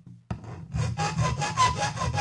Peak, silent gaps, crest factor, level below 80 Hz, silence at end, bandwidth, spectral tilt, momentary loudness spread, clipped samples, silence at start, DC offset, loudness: -10 dBFS; none; 18 dB; -44 dBFS; 0 s; 11.5 kHz; -4.5 dB/octave; 14 LU; under 0.1%; 0.05 s; under 0.1%; -27 LUFS